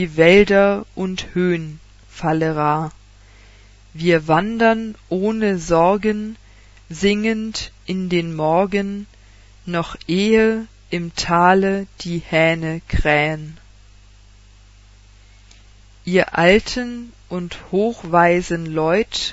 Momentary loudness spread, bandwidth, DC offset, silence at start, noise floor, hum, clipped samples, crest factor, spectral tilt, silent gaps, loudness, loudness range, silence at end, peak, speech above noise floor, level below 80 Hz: 14 LU; 8 kHz; under 0.1%; 0 s; -46 dBFS; 50 Hz at -45 dBFS; under 0.1%; 20 dB; -5.5 dB/octave; none; -18 LUFS; 4 LU; 0 s; 0 dBFS; 29 dB; -38 dBFS